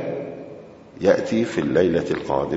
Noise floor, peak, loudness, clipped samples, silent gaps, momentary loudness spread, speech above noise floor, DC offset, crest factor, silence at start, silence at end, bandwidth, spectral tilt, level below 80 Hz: -41 dBFS; -4 dBFS; -21 LUFS; under 0.1%; none; 18 LU; 21 dB; under 0.1%; 18 dB; 0 s; 0 s; 8 kHz; -6.5 dB/octave; -52 dBFS